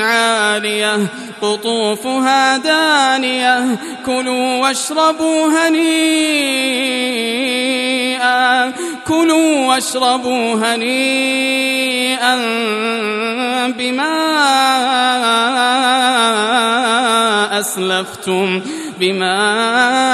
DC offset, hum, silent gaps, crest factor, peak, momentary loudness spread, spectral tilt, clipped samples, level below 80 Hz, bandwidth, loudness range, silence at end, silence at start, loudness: under 0.1%; none; none; 14 dB; 0 dBFS; 6 LU; -2.5 dB/octave; under 0.1%; -62 dBFS; 14 kHz; 2 LU; 0 s; 0 s; -14 LUFS